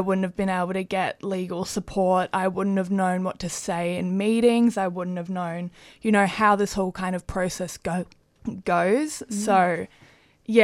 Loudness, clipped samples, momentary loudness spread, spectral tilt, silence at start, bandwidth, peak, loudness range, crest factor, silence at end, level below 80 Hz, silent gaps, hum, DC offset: -24 LUFS; under 0.1%; 11 LU; -5.5 dB/octave; 0 s; 14.5 kHz; -4 dBFS; 2 LU; 20 dB; 0 s; -52 dBFS; none; none; under 0.1%